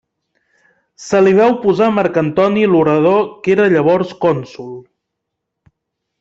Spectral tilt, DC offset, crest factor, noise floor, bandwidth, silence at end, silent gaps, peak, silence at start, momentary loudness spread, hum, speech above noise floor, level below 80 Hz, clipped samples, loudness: -7 dB/octave; under 0.1%; 14 dB; -77 dBFS; 8 kHz; 1.4 s; none; -2 dBFS; 1 s; 18 LU; none; 64 dB; -56 dBFS; under 0.1%; -13 LUFS